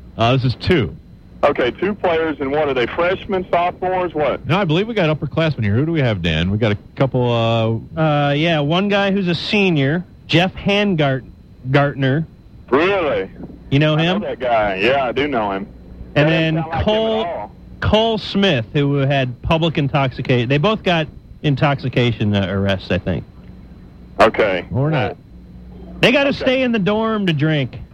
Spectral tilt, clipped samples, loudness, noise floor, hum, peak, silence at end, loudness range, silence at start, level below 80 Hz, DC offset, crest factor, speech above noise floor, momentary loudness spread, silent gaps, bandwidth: -7 dB/octave; under 0.1%; -17 LUFS; -39 dBFS; none; 0 dBFS; 0.05 s; 2 LU; 0 s; -40 dBFS; under 0.1%; 18 dB; 22 dB; 6 LU; none; 9 kHz